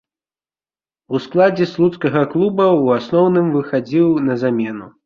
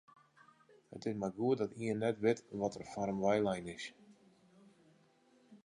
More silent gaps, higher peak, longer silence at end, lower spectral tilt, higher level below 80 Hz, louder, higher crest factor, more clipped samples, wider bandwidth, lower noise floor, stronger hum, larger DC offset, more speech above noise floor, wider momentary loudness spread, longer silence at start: neither; first, -2 dBFS vs -18 dBFS; about the same, 0.15 s vs 0.1 s; first, -8.5 dB/octave vs -6.5 dB/octave; first, -58 dBFS vs -72 dBFS; first, -16 LUFS vs -37 LUFS; about the same, 16 dB vs 20 dB; neither; second, 6.8 kHz vs 11 kHz; first, under -90 dBFS vs -69 dBFS; neither; neither; first, over 75 dB vs 33 dB; second, 6 LU vs 12 LU; first, 1.1 s vs 0.9 s